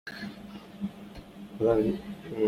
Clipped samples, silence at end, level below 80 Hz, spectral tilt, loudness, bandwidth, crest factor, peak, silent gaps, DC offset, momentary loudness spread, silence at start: under 0.1%; 0 s; -54 dBFS; -7.5 dB/octave; -31 LUFS; 15.5 kHz; 20 dB; -12 dBFS; none; under 0.1%; 20 LU; 0.05 s